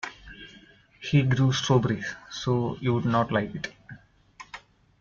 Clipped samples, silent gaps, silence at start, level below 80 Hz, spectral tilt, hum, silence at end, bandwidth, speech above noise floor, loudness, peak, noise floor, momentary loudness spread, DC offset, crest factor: under 0.1%; none; 0.05 s; -56 dBFS; -6 dB/octave; none; 0.4 s; 7.4 kHz; 29 dB; -26 LUFS; -10 dBFS; -54 dBFS; 22 LU; under 0.1%; 18 dB